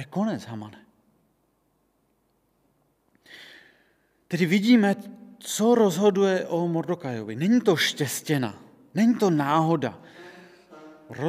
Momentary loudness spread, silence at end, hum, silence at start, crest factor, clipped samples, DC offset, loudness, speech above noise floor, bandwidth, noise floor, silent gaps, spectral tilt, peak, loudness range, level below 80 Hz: 23 LU; 0 s; none; 0 s; 18 dB; under 0.1%; under 0.1%; -24 LUFS; 46 dB; 16 kHz; -69 dBFS; none; -5.5 dB/octave; -8 dBFS; 7 LU; -76 dBFS